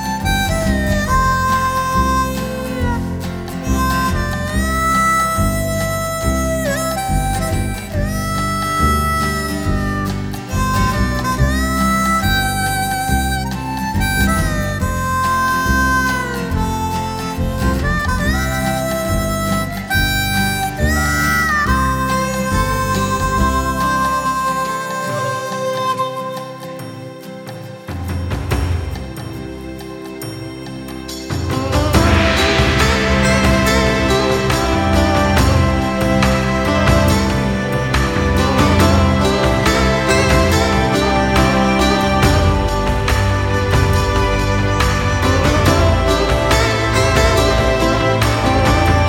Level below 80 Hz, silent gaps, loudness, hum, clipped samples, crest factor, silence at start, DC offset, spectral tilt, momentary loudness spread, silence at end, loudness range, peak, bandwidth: -24 dBFS; none; -16 LUFS; none; under 0.1%; 16 dB; 0 s; under 0.1%; -5 dB/octave; 9 LU; 0 s; 8 LU; 0 dBFS; over 20 kHz